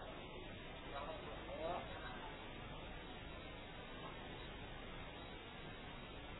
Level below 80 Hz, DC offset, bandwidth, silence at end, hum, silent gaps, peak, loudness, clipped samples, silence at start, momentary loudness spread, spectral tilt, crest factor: -58 dBFS; under 0.1%; 3.9 kHz; 0 s; none; none; -32 dBFS; -51 LUFS; under 0.1%; 0 s; 5 LU; -2.5 dB/octave; 18 dB